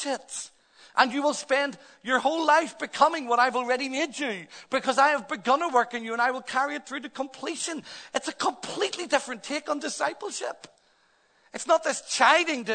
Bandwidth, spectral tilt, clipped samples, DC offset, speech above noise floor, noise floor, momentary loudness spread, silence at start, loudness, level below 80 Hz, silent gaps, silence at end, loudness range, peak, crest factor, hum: 9.4 kHz; -1.5 dB/octave; under 0.1%; under 0.1%; 38 dB; -65 dBFS; 13 LU; 0 s; -26 LUFS; -78 dBFS; none; 0 s; 6 LU; -4 dBFS; 24 dB; none